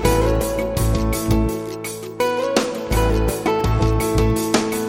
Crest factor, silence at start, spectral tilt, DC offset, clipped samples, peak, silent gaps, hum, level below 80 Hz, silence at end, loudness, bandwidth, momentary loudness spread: 18 dB; 0 s; -5.5 dB/octave; under 0.1%; under 0.1%; -2 dBFS; none; none; -26 dBFS; 0 s; -20 LUFS; 17 kHz; 5 LU